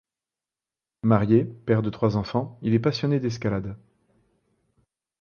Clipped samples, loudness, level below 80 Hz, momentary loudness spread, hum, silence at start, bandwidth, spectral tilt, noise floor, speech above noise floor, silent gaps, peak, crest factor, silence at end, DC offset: under 0.1%; -24 LUFS; -54 dBFS; 8 LU; none; 1.05 s; 6.8 kHz; -8 dB/octave; under -90 dBFS; over 67 dB; none; -4 dBFS; 22 dB; 1.45 s; under 0.1%